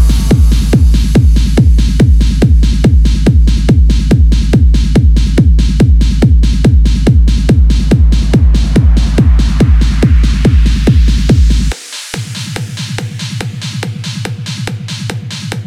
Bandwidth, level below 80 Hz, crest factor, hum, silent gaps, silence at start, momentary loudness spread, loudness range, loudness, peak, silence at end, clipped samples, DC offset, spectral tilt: 11.5 kHz; -10 dBFS; 8 dB; none; none; 0 s; 10 LU; 7 LU; -10 LUFS; 0 dBFS; 0 s; 0.1%; under 0.1%; -6.5 dB/octave